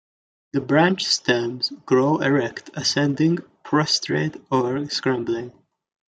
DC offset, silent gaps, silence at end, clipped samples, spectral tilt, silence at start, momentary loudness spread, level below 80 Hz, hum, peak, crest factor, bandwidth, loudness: under 0.1%; none; 0.65 s; under 0.1%; -4.5 dB/octave; 0.55 s; 9 LU; -64 dBFS; none; -2 dBFS; 20 dB; 9.2 kHz; -21 LUFS